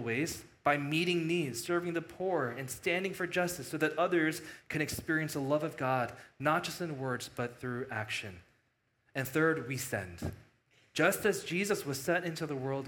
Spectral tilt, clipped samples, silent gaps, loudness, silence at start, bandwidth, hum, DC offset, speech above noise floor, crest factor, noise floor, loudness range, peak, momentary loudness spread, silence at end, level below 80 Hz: -4.5 dB/octave; under 0.1%; none; -34 LUFS; 0 s; 18 kHz; none; under 0.1%; 42 dB; 22 dB; -76 dBFS; 4 LU; -12 dBFS; 9 LU; 0 s; -66 dBFS